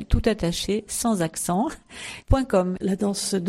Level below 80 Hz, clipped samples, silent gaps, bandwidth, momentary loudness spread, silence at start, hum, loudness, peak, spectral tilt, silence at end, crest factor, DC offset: -32 dBFS; under 0.1%; none; 16 kHz; 7 LU; 0 s; none; -24 LUFS; -4 dBFS; -5 dB/octave; 0 s; 20 dB; under 0.1%